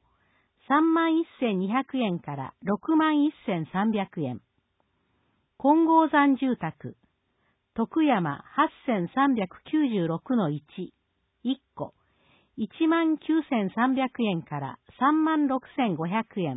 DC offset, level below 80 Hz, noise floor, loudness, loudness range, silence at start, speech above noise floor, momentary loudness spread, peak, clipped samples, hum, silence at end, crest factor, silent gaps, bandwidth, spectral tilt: under 0.1%; -68 dBFS; -73 dBFS; -26 LUFS; 4 LU; 0.7 s; 47 dB; 14 LU; -10 dBFS; under 0.1%; none; 0 s; 16 dB; none; 4 kHz; -11 dB/octave